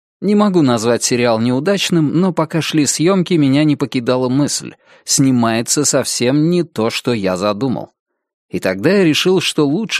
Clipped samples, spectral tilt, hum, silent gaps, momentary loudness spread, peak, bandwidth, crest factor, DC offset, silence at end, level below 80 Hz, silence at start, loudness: under 0.1%; -4.5 dB/octave; none; 8.00-8.06 s, 8.34-8.49 s; 6 LU; 0 dBFS; 15.5 kHz; 14 dB; under 0.1%; 0 s; -58 dBFS; 0.2 s; -15 LUFS